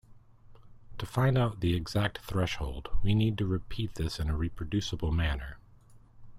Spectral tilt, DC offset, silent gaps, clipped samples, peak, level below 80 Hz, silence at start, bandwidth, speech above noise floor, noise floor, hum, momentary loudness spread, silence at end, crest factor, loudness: -6.5 dB/octave; under 0.1%; none; under 0.1%; -14 dBFS; -40 dBFS; 0.1 s; 15.5 kHz; 27 dB; -56 dBFS; none; 10 LU; 0 s; 18 dB; -31 LUFS